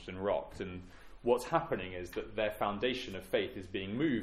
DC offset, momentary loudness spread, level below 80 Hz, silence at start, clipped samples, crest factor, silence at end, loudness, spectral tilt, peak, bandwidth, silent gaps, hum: under 0.1%; 10 LU; -58 dBFS; 0 s; under 0.1%; 20 dB; 0 s; -36 LUFS; -5.5 dB/octave; -16 dBFS; 15.5 kHz; none; none